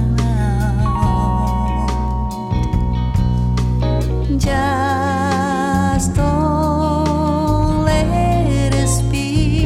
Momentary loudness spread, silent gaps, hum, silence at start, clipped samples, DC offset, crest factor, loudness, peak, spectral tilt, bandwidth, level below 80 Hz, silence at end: 3 LU; none; none; 0 s; under 0.1%; under 0.1%; 14 dB; -17 LUFS; -2 dBFS; -6.5 dB/octave; 14 kHz; -22 dBFS; 0 s